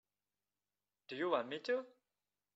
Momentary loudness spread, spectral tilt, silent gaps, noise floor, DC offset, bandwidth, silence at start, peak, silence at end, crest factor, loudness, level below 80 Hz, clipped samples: 13 LU; -2 dB/octave; none; under -90 dBFS; under 0.1%; 7.6 kHz; 1.1 s; -22 dBFS; 0.65 s; 22 dB; -40 LUFS; under -90 dBFS; under 0.1%